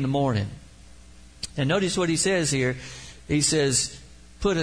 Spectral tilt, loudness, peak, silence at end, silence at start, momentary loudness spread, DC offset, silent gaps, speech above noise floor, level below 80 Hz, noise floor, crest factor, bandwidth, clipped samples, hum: -4 dB/octave; -24 LUFS; -8 dBFS; 0 s; 0 s; 15 LU; 0.2%; none; 25 dB; -46 dBFS; -49 dBFS; 18 dB; 10.5 kHz; under 0.1%; none